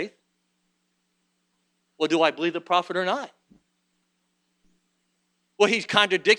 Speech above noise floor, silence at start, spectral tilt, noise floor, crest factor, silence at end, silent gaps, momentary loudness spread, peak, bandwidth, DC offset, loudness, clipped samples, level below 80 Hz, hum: 51 dB; 0 s; -3.5 dB/octave; -74 dBFS; 24 dB; 0 s; none; 11 LU; -2 dBFS; 11 kHz; under 0.1%; -23 LUFS; under 0.1%; -76 dBFS; 60 Hz at -65 dBFS